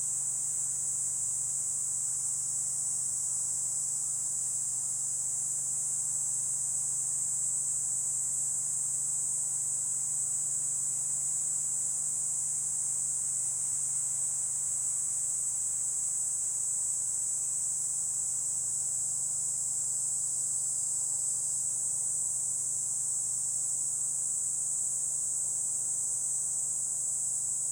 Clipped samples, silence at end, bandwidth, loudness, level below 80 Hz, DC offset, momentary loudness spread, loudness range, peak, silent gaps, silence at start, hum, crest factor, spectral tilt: under 0.1%; 0 s; 19 kHz; -29 LUFS; -70 dBFS; under 0.1%; 1 LU; 1 LU; -18 dBFS; none; 0 s; none; 14 dB; 0 dB/octave